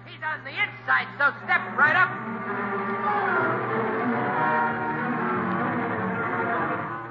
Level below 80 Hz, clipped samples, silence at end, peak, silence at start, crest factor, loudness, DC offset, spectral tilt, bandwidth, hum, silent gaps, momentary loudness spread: -66 dBFS; under 0.1%; 0 s; -8 dBFS; 0 s; 18 dB; -25 LUFS; under 0.1%; -8 dB/octave; 7 kHz; none; none; 8 LU